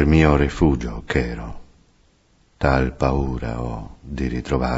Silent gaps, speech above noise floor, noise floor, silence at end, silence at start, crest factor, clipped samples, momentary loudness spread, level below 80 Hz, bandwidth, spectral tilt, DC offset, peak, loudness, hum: none; 38 dB; -58 dBFS; 0 s; 0 s; 18 dB; under 0.1%; 15 LU; -28 dBFS; 8 kHz; -7.5 dB/octave; under 0.1%; -2 dBFS; -21 LUFS; none